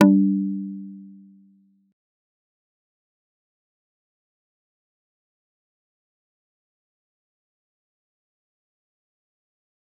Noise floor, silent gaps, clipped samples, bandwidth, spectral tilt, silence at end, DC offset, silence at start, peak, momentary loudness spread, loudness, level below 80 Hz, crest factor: -59 dBFS; none; under 0.1%; 4 kHz; -8.5 dB/octave; 8.9 s; under 0.1%; 0 s; -2 dBFS; 23 LU; -22 LUFS; -86 dBFS; 28 dB